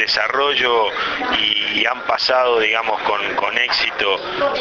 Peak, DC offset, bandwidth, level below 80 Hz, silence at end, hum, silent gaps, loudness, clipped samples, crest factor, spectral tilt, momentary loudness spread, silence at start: -2 dBFS; under 0.1%; 7.2 kHz; -52 dBFS; 0 s; none; none; -17 LUFS; under 0.1%; 16 dB; 1.5 dB/octave; 4 LU; 0 s